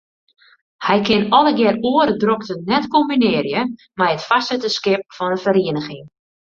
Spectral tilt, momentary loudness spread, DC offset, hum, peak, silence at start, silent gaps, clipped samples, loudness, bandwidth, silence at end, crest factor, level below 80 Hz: -5.5 dB/octave; 9 LU; under 0.1%; none; 0 dBFS; 0.8 s; none; under 0.1%; -17 LUFS; 7.6 kHz; 0.45 s; 18 dB; -56 dBFS